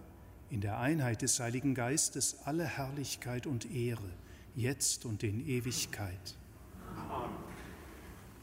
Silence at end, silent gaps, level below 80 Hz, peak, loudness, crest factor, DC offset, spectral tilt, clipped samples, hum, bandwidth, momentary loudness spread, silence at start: 0 s; none; -58 dBFS; -18 dBFS; -36 LUFS; 20 dB; under 0.1%; -4 dB/octave; under 0.1%; none; 16 kHz; 19 LU; 0 s